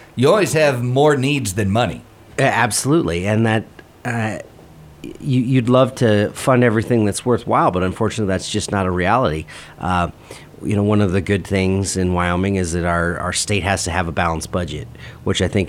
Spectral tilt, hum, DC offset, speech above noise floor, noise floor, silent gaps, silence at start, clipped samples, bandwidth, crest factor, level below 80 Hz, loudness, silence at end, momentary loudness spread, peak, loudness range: -5.5 dB/octave; none; under 0.1%; 24 dB; -42 dBFS; none; 0 s; under 0.1%; 16 kHz; 18 dB; -40 dBFS; -18 LUFS; 0 s; 13 LU; 0 dBFS; 3 LU